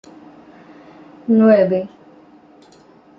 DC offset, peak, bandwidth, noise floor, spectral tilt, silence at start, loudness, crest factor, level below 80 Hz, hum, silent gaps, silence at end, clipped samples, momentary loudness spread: under 0.1%; -2 dBFS; 5.4 kHz; -48 dBFS; -9.5 dB/octave; 1.3 s; -14 LUFS; 18 dB; -66 dBFS; none; none; 1.3 s; under 0.1%; 20 LU